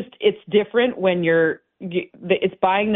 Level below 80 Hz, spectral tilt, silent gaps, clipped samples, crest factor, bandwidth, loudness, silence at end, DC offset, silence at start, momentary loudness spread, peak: -62 dBFS; -10.5 dB/octave; none; under 0.1%; 16 dB; 4 kHz; -20 LUFS; 0 s; under 0.1%; 0 s; 9 LU; -4 dBFS